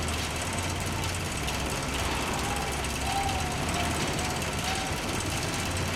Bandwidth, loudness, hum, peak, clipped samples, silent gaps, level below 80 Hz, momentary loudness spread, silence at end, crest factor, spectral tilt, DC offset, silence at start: 17 kHz; -29 LUFS; none; -16 dBFS; under 0.1%; none; -40 dBFS; 2 LU; 0 s; 14 dB; -3.5 dB/octave; under 0.1%; 0 s